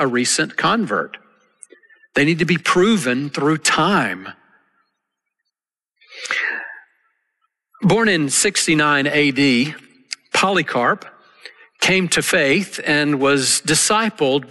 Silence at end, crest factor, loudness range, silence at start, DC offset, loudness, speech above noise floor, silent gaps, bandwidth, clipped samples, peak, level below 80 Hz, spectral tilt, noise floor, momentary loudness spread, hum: 0.05 s; 14 dB; 8 LU; 0 s; under 0.1%; -17 LUFS; 64 dB; none; 12.5 kHz; under 0.1%; -4 dBFS; -56 dBFS; -3.5 dB/octave; -82 dBFS; 9 LU; none